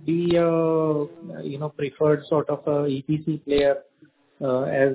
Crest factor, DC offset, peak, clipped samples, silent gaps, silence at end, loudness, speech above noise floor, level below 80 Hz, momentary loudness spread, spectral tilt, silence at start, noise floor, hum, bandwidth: 16 dB; under 0.1%; -6 dBFS; under 0.1%; none; 0 s; -24 LUFS; 32 dB; -54 dBFS; 11 LU; -11.5 dB/octave; 0 s; -55 dBFS; none; 4 kHz